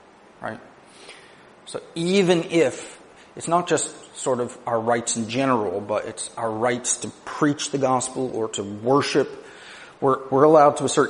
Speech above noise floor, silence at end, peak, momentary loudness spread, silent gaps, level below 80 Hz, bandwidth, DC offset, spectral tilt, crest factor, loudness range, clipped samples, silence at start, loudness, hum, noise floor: 21 dB; 0 s; -2 dBFS; 18 LU; none; -64 dBFS; 10.5 kHz; under 0.1%; -4 dB/octave; 20 dB; 3 LU; under 0.1%; 0.4 s; -22 LUFS; none; -43 dBFS